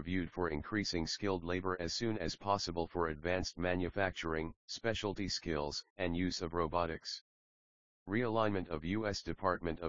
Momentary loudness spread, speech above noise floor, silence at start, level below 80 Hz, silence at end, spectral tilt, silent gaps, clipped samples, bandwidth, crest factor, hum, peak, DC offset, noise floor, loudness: 4 LU; over 53 dB; 0 s; -56 dBFS; 0 s; -4 dB/octave; 4.56-4.68 s, 5.90-5.96 s, 7.21-8.06 s; under 0.1%; 7.4 kHz; 20 dB; none; -16 dBFS; 0.2%; under -90 dBFS; -37 LUFS